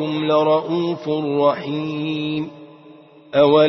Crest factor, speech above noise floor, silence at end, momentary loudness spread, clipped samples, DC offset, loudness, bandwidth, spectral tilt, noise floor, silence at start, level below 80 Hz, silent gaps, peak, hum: 16 dB; 27 dB; 0 s; 8 LU; under 0.1%; under 0.1%; -20 LUFS; 6.2 kHz; -8 dB/octave; -45 dBFS; 0 s; -64 dBFS; none; -2 dBFS; none